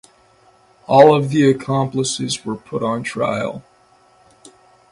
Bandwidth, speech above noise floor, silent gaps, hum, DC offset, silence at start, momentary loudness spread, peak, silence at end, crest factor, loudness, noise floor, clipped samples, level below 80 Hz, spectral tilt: 11.5 kHz; 37 dB; none; none; under 0.1%; 0.9 s; 14 LU; 0 dBFS; 1.3 s; 18 dB; -17 LUFS; -53 dBFS; under 0.1%; -58 dBFS; -5.5 dB/octave